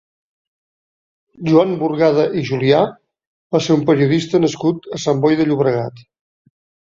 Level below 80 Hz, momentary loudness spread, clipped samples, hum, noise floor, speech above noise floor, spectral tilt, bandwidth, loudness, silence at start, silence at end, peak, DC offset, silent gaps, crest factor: -58 dBFS; 7 LU; under 0.1%; none; under -90 dBFS; over 75 dB; -6.5 dB/octave; 7.6 kHz; -16 LUFS; 1.4 s; 0.95 s; -2 dBFS; under 0.1%; 3.27-3.50 s; 16 dB